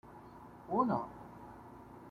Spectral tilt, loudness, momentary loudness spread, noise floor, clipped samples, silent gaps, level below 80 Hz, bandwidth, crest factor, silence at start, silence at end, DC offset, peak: -9 dB/octave; -36 LUFS; 21 LU; -54 dBFS; under 0.1%; none; -66 dBFS; 14.5 kHz; 22 dB; 0.05 s; 0 s; under 0.1%; -18 dBFS